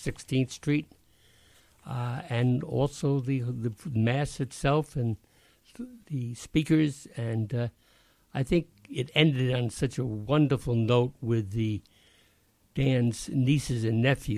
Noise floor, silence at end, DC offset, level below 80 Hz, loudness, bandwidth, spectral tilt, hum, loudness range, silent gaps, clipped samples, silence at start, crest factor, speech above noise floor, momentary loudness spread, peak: -66 dBFS; 0 s; under 0.1%; -50 dBFS; -29 LUFS; 13.5 kHz; -6.5 dB/octave; none; 4 LU; none; under 0.1%; 0 s; 22 dB; 38 dB; 11 LU; -6 dBFS